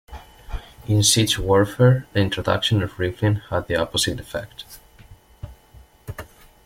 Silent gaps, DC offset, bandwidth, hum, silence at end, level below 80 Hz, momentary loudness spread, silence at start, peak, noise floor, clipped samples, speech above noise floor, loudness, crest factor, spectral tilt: none; under 0.1%; 16.5 kHz; none; 0.4 s; -42 dBFS; 23 LU; 0.1 s; -2 dBFS; -49 dBFS; under 0.1%; 29 dB; -20 LUFS; 20 dB; -4.5 dB/octave